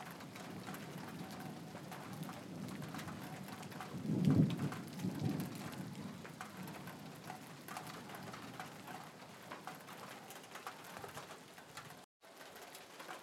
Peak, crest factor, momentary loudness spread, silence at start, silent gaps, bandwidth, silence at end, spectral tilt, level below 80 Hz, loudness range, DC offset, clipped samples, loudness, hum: -18 dBFS; 26 dB; 12 LU; 0 s; 12.04-12.20 s; 16.5 kHz; 0 s; -6 dB/octave; -76 dBFS; 12 LU; under 0.1%; under 0.1%; -45 LUFS; none